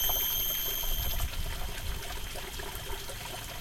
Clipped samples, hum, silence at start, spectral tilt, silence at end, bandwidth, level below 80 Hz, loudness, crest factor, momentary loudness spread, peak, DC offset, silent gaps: under 0.1%; none; 0 s; -2 dB/octave; 0 s; 17 kHz; -38 dBFS; -33 LUFS; 16 dB; 11 LU; -16 dBFS; under 0.1%; none